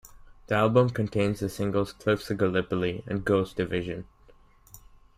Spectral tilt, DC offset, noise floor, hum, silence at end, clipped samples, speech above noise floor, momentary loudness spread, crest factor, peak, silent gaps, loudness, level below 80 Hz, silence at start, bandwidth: -7 dB/octave; under 0.1%; -56 dBFS; none; 0.4 s; under 0.1%; 30 dB; 8 LU; 20 dB; -8 dBFS; none; -27 LUFS; -52 dBFS; 0.05 s; 16 kHz